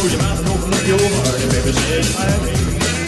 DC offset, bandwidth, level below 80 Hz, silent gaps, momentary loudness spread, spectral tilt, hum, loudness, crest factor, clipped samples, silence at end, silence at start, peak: under 0.1%; 12.5 kHz; -26 dBFS; none; 3 LU; -4.5 dB/octave; none; -16 LUFS; 10 dB; under 0.1%; 0 s; 0 s; -6 dBFS